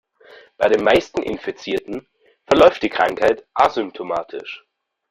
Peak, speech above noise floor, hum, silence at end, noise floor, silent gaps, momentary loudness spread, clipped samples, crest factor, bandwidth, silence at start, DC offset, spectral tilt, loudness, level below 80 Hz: 0 dBFS; 29 dB; none; 0.55 s; -47 dBFS; none; 18 LU; under 0.1%; 20 dB; 14.5 kHz; 0.6 s; under 0.1%; -5 dB/octave; -18 LUFS; -50 dBFS